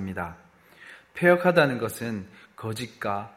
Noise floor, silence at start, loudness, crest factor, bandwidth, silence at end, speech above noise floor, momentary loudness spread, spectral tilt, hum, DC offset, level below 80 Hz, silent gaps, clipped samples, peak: -50 dBFS; 0 s; -25 LUFS; 22 dB; 16 kHz; 0.05 s; 25 dB; 18 LU; -6 dB/octave; none; under 0.1%; -62 dBFS; none; under 0.1%; -4 dBFS